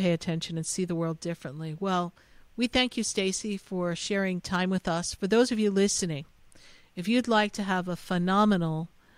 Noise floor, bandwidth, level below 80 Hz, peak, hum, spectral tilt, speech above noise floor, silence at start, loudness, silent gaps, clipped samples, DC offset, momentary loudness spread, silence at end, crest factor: -54 dBFS; 15 kHz; -56 dBFS; -10 dBFS; none; -4.5 dB/octave; 26 dB; 0 s; -28 LUFS; none; under 0.1%; under 0.1%; 12 LU; 0.3 s; 18 dB